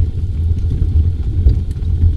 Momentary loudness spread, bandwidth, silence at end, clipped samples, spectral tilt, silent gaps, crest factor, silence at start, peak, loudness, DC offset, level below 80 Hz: 4 LU; 4.7 kHz; 0 s; under 0.1%; -10 dB/octave; none; 14 dB; 0 s; 0 dBFS; -17 LUFS; under 0.1%; -16 dBFS